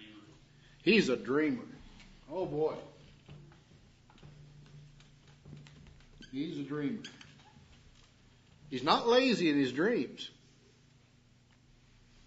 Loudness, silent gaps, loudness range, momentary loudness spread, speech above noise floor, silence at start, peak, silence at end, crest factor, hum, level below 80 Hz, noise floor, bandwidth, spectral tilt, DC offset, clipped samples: -32 LUFS; none; 12 LU; 28 LU; 33 dB; 0 s; -12 dBFS; 1.95 s; 24 dB; 60 Hz at -70 dBFS; -66 dBFS; -64 dBFS; 7.6 kHz; -3.5 dB/octave; under 0.1%; under 0.1%